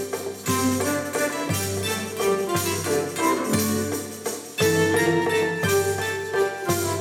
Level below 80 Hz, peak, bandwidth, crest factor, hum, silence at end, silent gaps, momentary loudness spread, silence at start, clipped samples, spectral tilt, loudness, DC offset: -62 dBFS; -8 dBFS; 18.5 kHz; 16 dB; none; 0 s; none; 7 LU; 0 s; under 0.1%; -4 dB/octave; -23 LUFS; under 0.1%